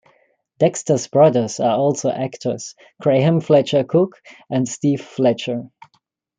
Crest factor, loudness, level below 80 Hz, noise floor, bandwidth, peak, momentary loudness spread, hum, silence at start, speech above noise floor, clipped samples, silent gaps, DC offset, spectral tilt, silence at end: 16 dB; -18 LUFS; -64 dBFS; -61 dBFS; 9.6 kHz; -2 dBFS; 11 LU; none; 0.6 s; 43 dB; under 0.1%; none; under 0.1%; -6 dB/octave; 0.7 s